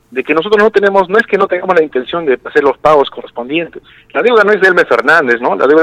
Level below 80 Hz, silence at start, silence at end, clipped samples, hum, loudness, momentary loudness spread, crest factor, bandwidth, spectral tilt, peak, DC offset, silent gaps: -50 dBFS; 0.1 s; 0 s; 0.3%; none; -11 LUFS; 9 LU; 10 dB; 10.5 kHz; -5.5 dB/octave; 0 dBFS; under 0.1%; none